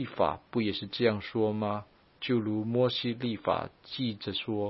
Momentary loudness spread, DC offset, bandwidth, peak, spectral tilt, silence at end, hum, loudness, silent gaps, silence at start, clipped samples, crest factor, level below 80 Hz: 6 LU; under 0.1%; 5.8 kHz; -10 dBFS; -10 dB/octave; 0 s; none; -31 LUFS; none; 0 s; under 0.1%; 20 dB; -64 dBFS